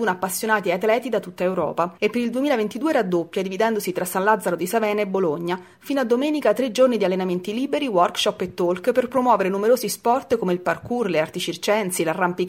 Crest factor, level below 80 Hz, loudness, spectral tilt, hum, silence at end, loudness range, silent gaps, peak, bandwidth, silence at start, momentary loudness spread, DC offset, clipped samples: 16 dB; -64 dBFS; -22 LUFS; -4.5 dB/octave; none; 0 s; 2 LU; none; -4 dBFS; 16.5 kHz; 0 s; 5 LU; under 0.1%; under 0.1%